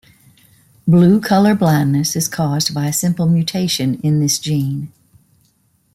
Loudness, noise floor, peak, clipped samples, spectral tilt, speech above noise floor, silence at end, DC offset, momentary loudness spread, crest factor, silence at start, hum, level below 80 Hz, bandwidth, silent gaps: -15 LUFS; -59 dBFS; -2 dBFS; under 0.1%; -5.5 dB/octave; 44 dB; 1.05 s; under 0.1%; 7 LU; 14 dB; 0.85 s; none; -54 dBFS; 16 kHz; none